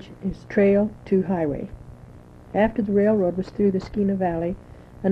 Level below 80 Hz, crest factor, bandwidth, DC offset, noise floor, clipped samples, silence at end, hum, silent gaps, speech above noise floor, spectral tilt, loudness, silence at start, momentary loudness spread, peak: -46 dBFS; 16 dB; 6.2 kHz; under 0.1%; -45 dBFS; under 0.1%; 0 s; none; none; 23 dB; -9.5 dB/octave; -23 LUFS; 0 s; 13 LU; -6 dBFS